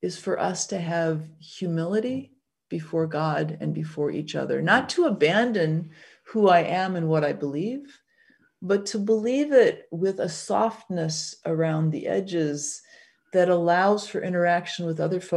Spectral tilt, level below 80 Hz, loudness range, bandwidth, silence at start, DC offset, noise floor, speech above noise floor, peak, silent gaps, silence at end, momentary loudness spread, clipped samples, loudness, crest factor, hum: -5.5 dB/octave; -72 dBFS; 5 LU; 11.5 kHz; 0 s; under 0.1%; -62 dBFS; 38 dB; -6 dBFS; none; 0 s; 10 LU; under 0.1%; -25 LUFS; 20 dB; none